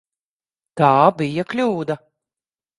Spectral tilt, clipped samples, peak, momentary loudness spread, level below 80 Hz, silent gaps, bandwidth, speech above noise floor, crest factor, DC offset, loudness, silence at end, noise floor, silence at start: -7.5 dB/octave; under 0.1%; 0 dBFS; 15 LU; -64 dBFS; none; 11.5 kHz; over 73 dB; 20 dB; under 0.1%; -18 LUFS; 0.8 s; under -90 dBFS; 0.75 s